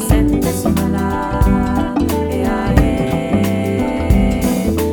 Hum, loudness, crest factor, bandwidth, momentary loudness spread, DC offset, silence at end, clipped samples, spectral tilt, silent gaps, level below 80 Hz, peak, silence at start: none; -16 LUFS; 14 dB; over 20 kHz; 3 LU; under 0.1%; 0 s; under 0.1%; -6.5 dB/octave; none; -22 dBFS; 0 dBFS; 0 s